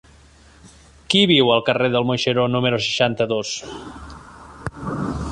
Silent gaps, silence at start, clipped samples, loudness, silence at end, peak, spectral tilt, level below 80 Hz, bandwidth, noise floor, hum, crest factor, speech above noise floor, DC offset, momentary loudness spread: none; 0.65 s; under 0.1%; -19 LUFS; 0 s; -2 dBFS; -4.5 dB/octave; -44 dBFS; 11 kHz; -49 dBFS; none; 18 dB; 30 dB; under 0.1%; 21 LU